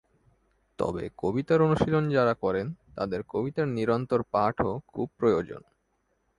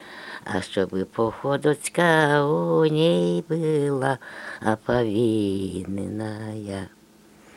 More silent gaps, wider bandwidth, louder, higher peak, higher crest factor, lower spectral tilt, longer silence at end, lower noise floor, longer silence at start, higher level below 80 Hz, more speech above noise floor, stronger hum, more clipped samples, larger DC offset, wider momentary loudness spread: neither; second, 11 kHz vs 13.5 kHz; second, -28 LUFS vs -23 LUFS; second, -10 dBFS vs -4 dBFS; about the same, 18 dB vs 20 dB; first, -8.5 dB/octave vs -6 dB/octave; about the same, 0.8 s vs 0.7 s; first, -73 dBFS vs -52 dBFS; first, 0.8 s vs 0 s; about the same, -54 dBFS vs -58 dBFS; first, 47 dB vs 29 dB; neither; neither; neither; second, 10 LU vs 13 LU